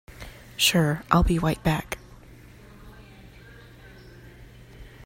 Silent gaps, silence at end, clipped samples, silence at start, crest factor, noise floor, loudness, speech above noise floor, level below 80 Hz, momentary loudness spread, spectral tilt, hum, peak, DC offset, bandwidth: none; 0 s; under 0.1%; 0.2 s; 26 dB; -48 dBFS; -23 LUFS; 26 dB; -38 dBFS; 21 LU; -4.5 dB/octave; none; -2 dBFS; under 0.1%; 16 kHz